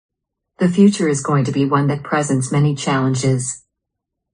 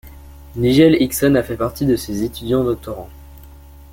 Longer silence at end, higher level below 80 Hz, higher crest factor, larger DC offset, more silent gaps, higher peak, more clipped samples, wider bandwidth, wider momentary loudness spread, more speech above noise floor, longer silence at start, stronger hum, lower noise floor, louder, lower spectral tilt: first, 0.75 s vs 0.45 s; second, -54 dBFS vs -38 dBFS; about the same, 16 dB vs 16 dB; neither; neither; about the same, -2 dBFS vs -2 dBFS; neither; second, 10 kHz vs 17 kHz; second, 7 LU vs 19 LU; first, 63 dB vs 24 dB; first, 0.6 s vs 0.05 s; neither; first, -79 dBFS vs -40 dBFS; about the same, -17 LUFS vs -17 LUFS; about the same, -6 dB/octave vs -6 dB/octave